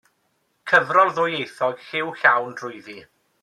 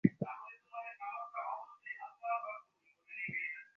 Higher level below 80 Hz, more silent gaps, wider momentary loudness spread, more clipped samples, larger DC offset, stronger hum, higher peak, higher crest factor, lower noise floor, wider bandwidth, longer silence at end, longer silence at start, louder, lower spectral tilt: about the same, -74 dBFS vs -76 dBFS; neither; first, 19 LU vs 10 LU; neither; neither; neither; first, -2 dBFS vs -12 dBFS; second, 20 dB vs 28 dB; about the same, -69 dBFS vs -69 dBFS; first, 13 kHz vs 6 kHz; first, 0.4 s vs 0.15 s; first, 0.65 s vs 0.05 s; first, -20 LUFS vs -42 LUFS; second, -4.5 dB/octave vs -7.5 dB/octave